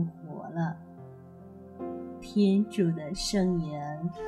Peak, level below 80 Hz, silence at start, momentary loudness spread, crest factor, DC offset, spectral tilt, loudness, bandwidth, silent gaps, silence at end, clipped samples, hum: -14 dBFS; -54 dBFS; 0 s; 23 LU; 16 dB; under 0.1%; -6.5 dB/octave; -30 LUFS; 13.5 kHz; none; 0 s; under 0.1%; none